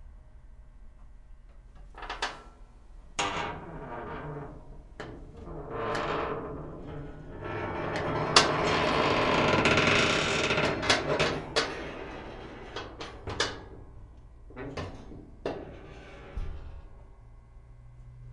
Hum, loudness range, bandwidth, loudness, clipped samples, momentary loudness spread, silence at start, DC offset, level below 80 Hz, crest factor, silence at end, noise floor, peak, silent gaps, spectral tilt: none; 18 LU; 11.5 kHz; -28 LUFS; under 0.1%; 23 LU; 0 s; under 0.1%; -48 dBFS; 30 dB; 0 s; -51 dBFS; -2 dBFS; none; -3.5 dB/octave